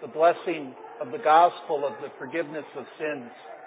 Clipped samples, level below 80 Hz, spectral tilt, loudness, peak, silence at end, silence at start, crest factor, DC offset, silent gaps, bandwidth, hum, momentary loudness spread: under 0.1%; under -90 dBFS; -8.5 dB/octave; -25 LUFS; -6 dBFS; 0 s; 0 s; 20 dB; under 0.1%; none; 4 kHz; none; 19 LU